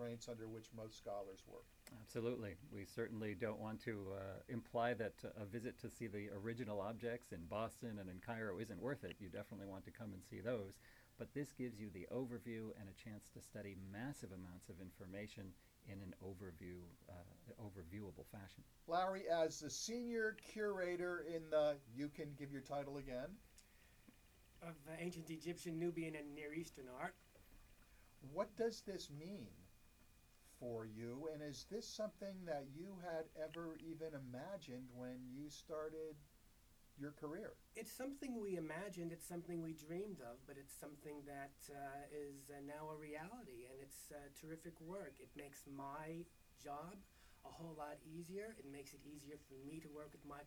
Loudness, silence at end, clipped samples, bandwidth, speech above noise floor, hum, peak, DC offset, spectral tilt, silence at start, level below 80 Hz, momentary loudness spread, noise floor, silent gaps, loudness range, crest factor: -50 LUFS; 0 s; under 0.1%; over 20 kHz; 20 dB; none; -28 dBFS; under 0.1%; -5.5 dB/octave; 0 s; -72 dBFS; 15 LU; -70 dBFS; none; 10 LU; 22 dB